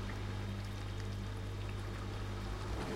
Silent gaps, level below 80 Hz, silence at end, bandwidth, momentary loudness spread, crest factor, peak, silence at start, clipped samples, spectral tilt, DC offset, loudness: none; -46 dBFS; 0 s; 15.5 kHz; 1 LU; 12 dB; -28 dBFS; 0 s; under 0.1%; -6 dB/octave; under 0.1%; -43 LUFS